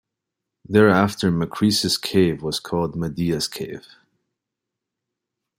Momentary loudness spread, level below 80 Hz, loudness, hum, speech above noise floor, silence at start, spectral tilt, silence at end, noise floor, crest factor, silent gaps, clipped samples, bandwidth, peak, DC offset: 10 LU; -54 dBFS; -20 LUFS; none; 63 dB; 0.7 s; -5 dB/octave; 1.8 s; -84 dBFS; 20 dB; none; under 0.1%; 16 kHz; -2 dBFS; under 0.1%